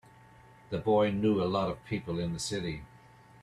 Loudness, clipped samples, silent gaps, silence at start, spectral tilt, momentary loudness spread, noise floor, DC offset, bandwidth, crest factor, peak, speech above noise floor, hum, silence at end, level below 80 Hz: -31 LUFS; under 0.1%; none; 0.7 s; -6 dB/octave; 11 LU; -56 dBFS; under 0.1%; 13 kHz; 16 dB; -16 dBFS; 26 dB; none; 0.6 s; -58 dBFS